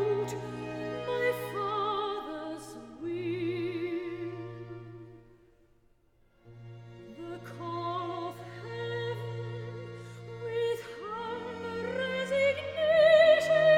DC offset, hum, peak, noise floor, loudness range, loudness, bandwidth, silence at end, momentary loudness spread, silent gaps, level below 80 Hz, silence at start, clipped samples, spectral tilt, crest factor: under 0.1%; none; -10 dBFS; -65 dBFS; 14 LU; -31 LUFS; 16.5 kHz; 0 s; 21 LU; none; -66 dBFS; 0 s; under 0.1%; -5.5 dB/octave; 20 dB